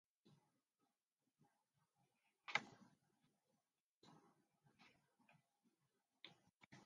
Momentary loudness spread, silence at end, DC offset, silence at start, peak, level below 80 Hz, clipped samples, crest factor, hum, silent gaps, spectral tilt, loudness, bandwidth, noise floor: 19 LU; 0 s; under 0.1%; 0.25 s; -24 dBFS; under -90 dBFS; under 0.1%; 36 dB; none; 1.05-1.09 s, 3.80-4.02 s, 6.55-6.60 s, 6.66-6.71 s; -2 dB/octave; -47 LUFS; 10 kHz; under -90 dBFS